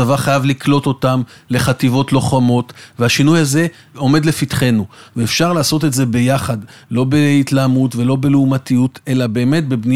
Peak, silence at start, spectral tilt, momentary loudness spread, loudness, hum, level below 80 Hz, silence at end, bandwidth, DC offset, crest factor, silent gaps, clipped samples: -2 dBFS; 0 s; -5.5 dB/octave; 7 LU; -15 LUFS; none; -46 dBFS; 0 s; 16 kHz; under 0.1%; 14 dB; none; under 0.1%